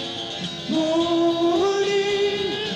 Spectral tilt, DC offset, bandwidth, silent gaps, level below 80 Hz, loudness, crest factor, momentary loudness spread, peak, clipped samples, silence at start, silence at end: -4.5 dB/octave; under 0.1%; 9.4 kHz; none; -58 dBFS; -22 LUFS; 10 dB; 8 LU; -12 dBFS; under 0.1%; 0 s; 0 s